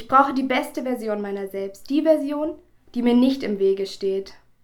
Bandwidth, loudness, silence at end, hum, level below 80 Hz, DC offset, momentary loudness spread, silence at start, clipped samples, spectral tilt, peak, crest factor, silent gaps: 18 kHz; -23 LUFS; 0.3 s; none; -56 dBFS; under 0.1%; 12 LU; 0 s; under 0.1%; -5.5 dB/octave; -4 dBFS; 20 dB; none